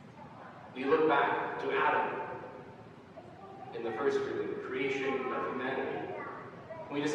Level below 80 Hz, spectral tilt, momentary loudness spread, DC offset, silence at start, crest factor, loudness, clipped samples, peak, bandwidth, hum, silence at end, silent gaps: -74 dBFS; -5.5 dB/octave; 21 LU; under 0.1%; 0 s; 18 dB; -33 LUFS; under 0.1%; -16 dBFS; 8.8 kHz; none; 0 s; none